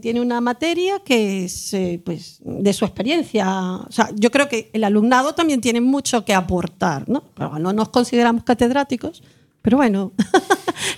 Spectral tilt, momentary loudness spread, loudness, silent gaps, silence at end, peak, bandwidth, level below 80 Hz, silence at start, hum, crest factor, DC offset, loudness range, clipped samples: -4.5 dB/octave; 8 LU; -19 LUFS; none; 0 s; 0 dBFS; 15.5 kHz; -48 dBFS; 0.05 s; none; 18 dB; under 0.1%; 3 LU; under 0.1%